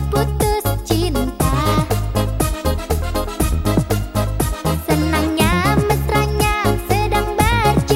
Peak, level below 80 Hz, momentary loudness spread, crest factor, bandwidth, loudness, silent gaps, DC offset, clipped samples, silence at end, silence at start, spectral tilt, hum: -2 dBFS; -24 dBFS; 5 LU; 16 dB; 17 kHz; -18 LUFS; none; under 0.1%; under 0.1%; 0 s; 0 s; -5.5 dB/octave; none